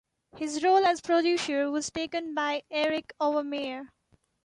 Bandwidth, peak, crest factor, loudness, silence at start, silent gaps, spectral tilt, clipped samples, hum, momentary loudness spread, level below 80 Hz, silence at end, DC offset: 11.5 kHz; -12 dBFS; 16 dB; -28 LUFS; 0.35 s; none; -2.5 dB/octave; under 0.1%; none; 11 LU; -70 dBFS; 0.6 s; under 0.1%